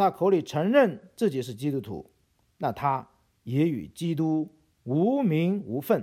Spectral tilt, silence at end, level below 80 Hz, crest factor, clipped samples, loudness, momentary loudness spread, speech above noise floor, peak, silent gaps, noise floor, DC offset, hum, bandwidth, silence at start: -7.5 dB/octave; 0 s; -66 dBFS; 18 dB; under 0.1%; -27 LUFS; 11 LU; 26 dB; -8 dBFS; none; -52 dBFS; under 0.1%; none; 16.5 kHz; 0 s